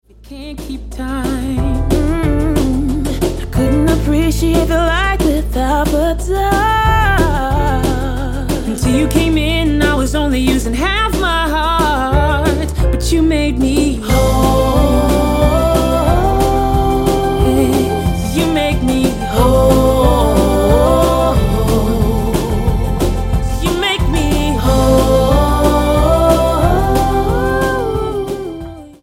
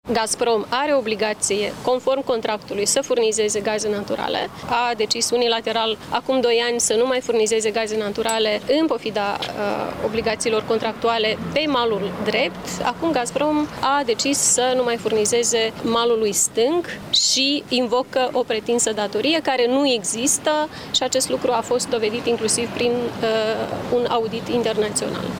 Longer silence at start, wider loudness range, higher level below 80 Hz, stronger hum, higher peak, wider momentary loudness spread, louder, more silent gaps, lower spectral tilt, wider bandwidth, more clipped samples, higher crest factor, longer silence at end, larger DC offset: first, 0.25 s vs 0.05 s; about the same, 3 LU vs 3 LU; first, -18 dBFS vs -54 dBFS; neither; first, 0 dBFS vs -6 dBFS; about the same, 6 LU vs 5 LU; first, -14 LUFS vs -20 LUFS; neither; first, -6 dB/octave vs -2.5 dB/octave; about the same, 16.5 kHz vs 17 kHz; neither; about the same, 12 dB vs 16 dB; about the same, 0.1 s vs 0 s; neither